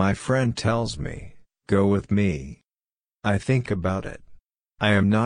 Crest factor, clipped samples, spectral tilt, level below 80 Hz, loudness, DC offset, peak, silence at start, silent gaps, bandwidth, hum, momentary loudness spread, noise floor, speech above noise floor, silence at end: 18 dB; under 0.1%; -6.5 dB/octave; -46 dBFS; -24 LUFS; under 0.1%; -6 dBFS; 0 s; none; 10.5 kHz; none; 13 LU; under -90 dBFS; over 68 dB; 0 s